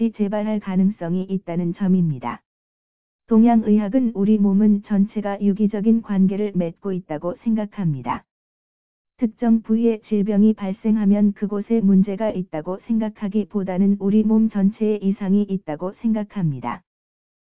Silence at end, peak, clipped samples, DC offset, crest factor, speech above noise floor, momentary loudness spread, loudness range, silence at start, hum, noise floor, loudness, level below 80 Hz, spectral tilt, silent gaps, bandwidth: 0.6 s; -6 dBFS; under 0.1%; 0.7%; 14 dB; over 71 dB; 10 LU; 5 LU; 0 s; none; under -90 dBFS; -20 LUFS; -58 dBFS; -13 dB/octave; 2.46-3.19 s, 8.31-9.05 s; 3.6 kHz